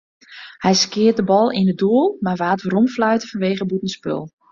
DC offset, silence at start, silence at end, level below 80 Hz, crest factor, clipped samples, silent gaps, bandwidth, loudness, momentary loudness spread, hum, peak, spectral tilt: under 0.1%; 0.3 s; 0.25 s; -58 dBFS; 14 dB; under 0.1%; none; 7.6 kHz; -18 LUFS; 10 LU; none; -4 dBFS; -5 dB/octave